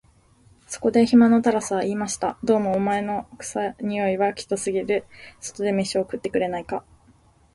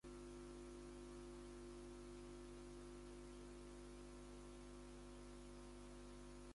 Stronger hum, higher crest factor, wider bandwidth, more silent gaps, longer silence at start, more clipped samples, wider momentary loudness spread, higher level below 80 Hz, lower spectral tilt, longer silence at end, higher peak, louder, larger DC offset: second, none vs 50 Hz at -60 dBFS; first, 18 dB vs 12 dB; about the same, 11.5 kHz vs 11.5 kHz; neither; first, 0.7 s vs 0.05 s; neither; first, 13 LU vs 2 LU; first, -56 dBFS vs -62 dBFS; about the same, -5 dB/octave vs -5 dB/octave; first, 0.75 s vs 0 s; first, -6 dBFS vs -46 dBFS; first, -23 LUFS vs -58 LUFS; neither